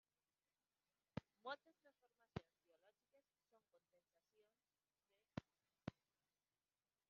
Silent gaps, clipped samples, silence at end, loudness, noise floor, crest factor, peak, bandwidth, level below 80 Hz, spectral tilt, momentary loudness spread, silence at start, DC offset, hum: none; under 0.1%; 1.2 s; -58 LUFS; under -90 dBFS; 32 dB; -30 dBFS; 6.2 kHz; -82 dBFS; -5 dB/octave; 3 LU; 1.15 s; under 0.1%; none